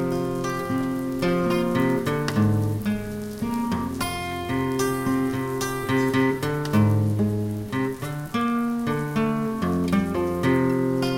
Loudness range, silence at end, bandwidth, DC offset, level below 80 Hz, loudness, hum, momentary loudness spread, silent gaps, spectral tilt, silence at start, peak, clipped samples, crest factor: 2 LU; 0 s; 17 kHz; under 0.1%; -46 dBFS; -24 LUFS; none; 6 LU; none; -6.5 dB/octave; 0 s; -8 dBFS; under 0.1%; 16 dB